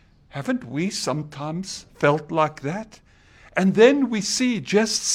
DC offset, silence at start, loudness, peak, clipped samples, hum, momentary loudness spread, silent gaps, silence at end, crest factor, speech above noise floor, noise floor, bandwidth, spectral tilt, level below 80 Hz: under 0.1%; 0.35 s; -22 LUFS; -2 dBFS; under 0.1%; none; 16 LU; none; 0 s; 20 dB; 30 dB; -51 dBFS; 15.5 kHz; -4 dB/octave; -58 dBFS